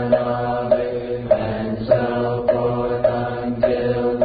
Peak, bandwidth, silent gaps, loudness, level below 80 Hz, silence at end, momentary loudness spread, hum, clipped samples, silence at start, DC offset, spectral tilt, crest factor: -4 dBFS; 5 kHz; none; -20 LUFS; -42 dBFS; 0 s; 5 LU; none; under 0.1%; 0 s; under 0.1%; -12 dB/octave; 16 dB